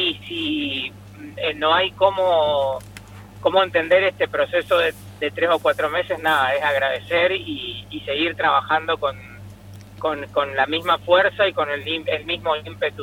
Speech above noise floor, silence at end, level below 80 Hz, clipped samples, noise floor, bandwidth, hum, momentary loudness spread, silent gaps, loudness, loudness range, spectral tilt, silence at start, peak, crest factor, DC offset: 20 dB; 0 s; -52 dBFS; under 0.1%; -41 dBFS; 16.5 kHz; 50 Hz at -45 dBFS; 12 LU; none; -20 LUFS; 3 LU; -4.5 dB/octave; 0 s; -2 dBFS; 18 dB; under 0.1%